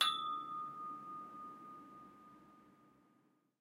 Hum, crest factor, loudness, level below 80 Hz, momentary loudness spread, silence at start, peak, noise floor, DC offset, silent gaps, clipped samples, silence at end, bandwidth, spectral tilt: none; 28 dB; -44 LUFS; -90 dBFS; 21 LU; 0 s; -16 dBFS; -75 dBFS; under 0.1%; none; under 0.1%; 0.7 s; 16 kHz; -1 dB/octave